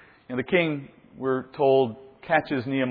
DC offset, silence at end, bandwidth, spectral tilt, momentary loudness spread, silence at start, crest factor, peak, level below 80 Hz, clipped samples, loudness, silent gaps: under 0.1%; 0 s; 4.9 kHz; -9.5 dB/octave; 12 LU; 0.3 s; 18 dB; -6 dBFS; -64 dBFS; under 0.1%; -25 LUFS; none